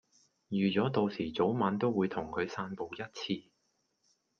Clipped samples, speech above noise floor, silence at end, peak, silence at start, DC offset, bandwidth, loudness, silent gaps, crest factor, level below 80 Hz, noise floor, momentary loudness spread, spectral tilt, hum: under 0.1%; 46 dB; 1 s; -14 dBFS; 0.5 s; under 0.1%; 7 kHz; -33 LUFS; none; 20 dB; -70 dBFS; -78 dBFS; 10 LU; -7 dB/octave; none